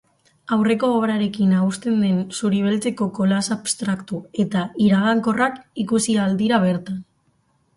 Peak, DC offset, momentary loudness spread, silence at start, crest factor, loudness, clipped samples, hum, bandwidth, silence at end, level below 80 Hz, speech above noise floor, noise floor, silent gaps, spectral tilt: -4 dBFS; under 0.1%; 6 LU; 0.5 s; 16 dB; -20 LUFS; under 0.1%; none; 11.5 kHz; 0.75 s; -60 dBFS; 44 dB; -64 dBFS; none; -5.5 dB/octave